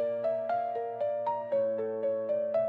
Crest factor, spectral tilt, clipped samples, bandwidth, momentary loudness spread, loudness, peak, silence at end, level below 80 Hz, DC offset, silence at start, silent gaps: 10 dB; -8 dB/octave; under 0.1%; 4.6 kHz; 3 LU; -32 LUFS; -20 dBFS; 0 s; -90 dBFS; under 0.1%; 0 s; none